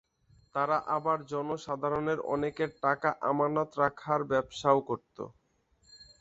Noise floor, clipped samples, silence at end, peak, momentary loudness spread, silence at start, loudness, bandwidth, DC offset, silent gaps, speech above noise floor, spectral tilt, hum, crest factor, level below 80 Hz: -70 dBFS; under 0.1%; 0.2 s; -10 dBFS; 10 LU; 0.55 s; -31 LUFS; 8 kHz; under 0.1%; none; 39 dB; -6.5 dB/octave; none; 22 dB; -64 dBFS